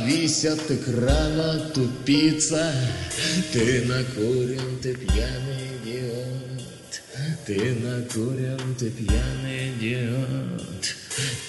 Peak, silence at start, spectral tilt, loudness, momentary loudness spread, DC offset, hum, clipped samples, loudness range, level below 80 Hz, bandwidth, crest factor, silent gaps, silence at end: -6 dBFS; 0 s; -4.5 dB/octave; -25 LUFS; 10 LU; under 0.1%; none; under 0.1%; 6 LU; -34 dBFS; 11.5 kHz; 20 dB; none; 0 s